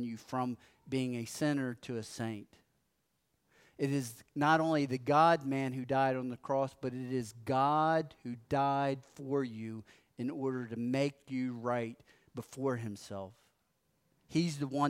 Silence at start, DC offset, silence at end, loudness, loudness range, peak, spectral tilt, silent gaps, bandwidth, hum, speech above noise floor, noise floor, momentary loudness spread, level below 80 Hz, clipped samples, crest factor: 0 s; under 0.1%; 0 s; -34 LUFS; 8 LU; -16 dBFS; -6 dB/octave; none; 16 kHz; none; 46 dB; -80 dBFS; 15 LU; -74 dBFS; under 0.1%; 20 dB